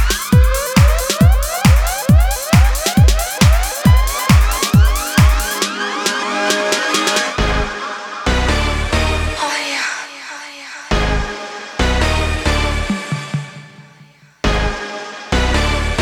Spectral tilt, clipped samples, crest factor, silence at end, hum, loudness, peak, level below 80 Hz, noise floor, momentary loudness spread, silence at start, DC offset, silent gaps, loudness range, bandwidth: -4.5 dB/octave; under 0.1%; 14 dB; 0 s; none; -15 LUFS; 0 dBFS; -18 dBFS; -45 dBFS; 11 LU; 0 s; under 0.1%; none; 7 LU; 19.5 kHz